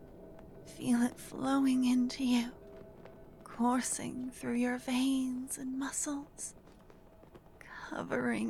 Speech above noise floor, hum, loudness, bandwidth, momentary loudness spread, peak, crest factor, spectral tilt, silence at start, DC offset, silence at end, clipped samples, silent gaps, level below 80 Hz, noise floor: 24 dB; none; -34 LUFS; 14 kHz; 23 LU; -20 dBFS; 16 dB; -3.5 dB/octave; 0 s; under 0.1%; 0 s; under 0.1%; none; -62 dBFS; -57 dBFS